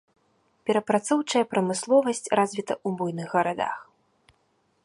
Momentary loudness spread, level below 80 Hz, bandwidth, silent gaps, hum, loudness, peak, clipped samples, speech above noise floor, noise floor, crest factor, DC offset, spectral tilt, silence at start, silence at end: 8 LU; -72 dBFS; 11.5 kHz; none; none; -25 LUFS; -6 dBFS; under 0.1%; 44 dB; -69 dBFS; 20 dB; under 0.1%; -4.5 dB/octave; 0.65 s; 1 s